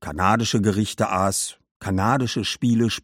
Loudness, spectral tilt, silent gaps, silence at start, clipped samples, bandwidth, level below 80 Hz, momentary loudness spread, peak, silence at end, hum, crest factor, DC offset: -22 LUFS; -4.5 dB/octave; 1.71-1.80 s; 0 s; under 0.1%; 16.5 kHz; -50 dBFS; 6 LU; -2 dBFS; 0.05 s; none; 18 dB; under 0.1%